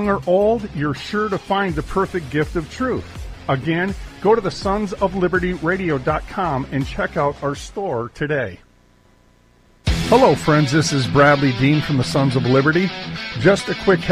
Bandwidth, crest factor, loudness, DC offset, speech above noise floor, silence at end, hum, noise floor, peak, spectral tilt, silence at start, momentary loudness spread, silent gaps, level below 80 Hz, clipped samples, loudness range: 15 kHz; 16 dB; -19 LUFS; under 0.1%; 35 dB; 0 s; none; -53 dBFS; -2 dBFS; -6 dB/octave; 0 s; 10 LU; none; -36 dBFS; under 0.1%; 7 LU